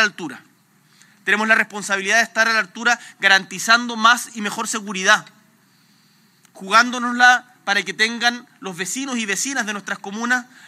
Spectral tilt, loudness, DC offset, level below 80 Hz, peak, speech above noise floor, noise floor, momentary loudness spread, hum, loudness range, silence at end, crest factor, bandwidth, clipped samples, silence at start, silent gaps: -1.5 dB/octave; -18 LUFS; under 0.1%; -86 dBFS; 0 dBFS; 37 dB; -56 dBFS; 12 LU; none; 3 LU; 0.25 s; 20 dB; 16 kHz; under 0.1%; 0 s; none